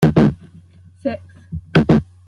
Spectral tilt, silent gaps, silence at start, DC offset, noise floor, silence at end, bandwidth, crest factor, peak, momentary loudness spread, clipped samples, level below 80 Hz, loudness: -8.5 dB/octave; none; 0 s; under 0.1%; -45 dBFS; 0.25 s; 10.5 kHz; 16 dB; -2 dBFS; 19 LU; under 0.1%; -40 dBFS; -18 LUFS